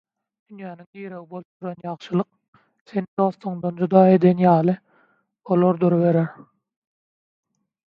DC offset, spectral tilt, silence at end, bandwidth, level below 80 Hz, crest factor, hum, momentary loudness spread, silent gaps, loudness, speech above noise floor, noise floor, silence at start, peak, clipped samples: under 0.1%; -10.5 dB/octave; 1.6 s; 5 kHz; -68 dBFS; 20 dB; none; 22 LU; 0.86-0.93 s, 1.45-1.60 s, 2.48-2.53 s, 2.81-2.85 s, 3.08-3.17 s; -20 LUFS; 43 dB; -63 dBFS; 0.5 s; -2 dBFS; under 0.1%